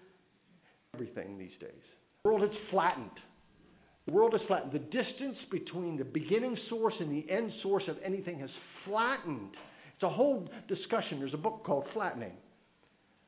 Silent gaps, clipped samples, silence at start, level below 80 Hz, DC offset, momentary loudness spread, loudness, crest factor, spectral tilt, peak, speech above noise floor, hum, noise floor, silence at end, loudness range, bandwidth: none; under 0.1%; 0.95 s; -74 dBFS; under 0.1%; 17 LU; -34 LUFS; 20 dB; -4.5 dB/octave; -16 dBFS; 35 dB; none; -69 dBFS; 0.9 s; 3 LU; 4 kHz